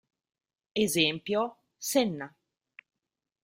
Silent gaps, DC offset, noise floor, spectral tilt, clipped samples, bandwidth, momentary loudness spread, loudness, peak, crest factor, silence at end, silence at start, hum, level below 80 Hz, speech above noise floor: none; under 0.1%; -89 dBFS; -3.5 dB/octave; under 0.1%; 16 kHz; 13 LU; -29 LUFS; -10 dBFS; 22 dB; 1.15 s; 0.75 s; none; -70 dBFS; 60 dB